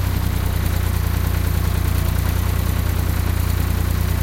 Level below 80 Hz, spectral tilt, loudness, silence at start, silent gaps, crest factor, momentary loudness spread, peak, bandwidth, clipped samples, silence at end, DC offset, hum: -22 dBFS; -5.5 dB/octave; -21 LUFS; 0 s; none; 12 dB; 1 LU; -6 dBFS; 17 kHz; under 0.1%; 0 s; under 0.1%; none